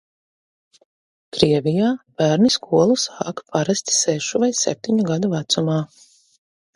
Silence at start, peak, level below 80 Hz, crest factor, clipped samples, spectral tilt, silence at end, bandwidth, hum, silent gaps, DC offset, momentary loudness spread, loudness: 1.35 s; 0 dBFS; -58 dBFS; 20 dB; under 0.1%; -4.5 dB/octave; 0.9 s; 11.5 kHz; none; none; under 0.1%; 8 LU; -19 LUFS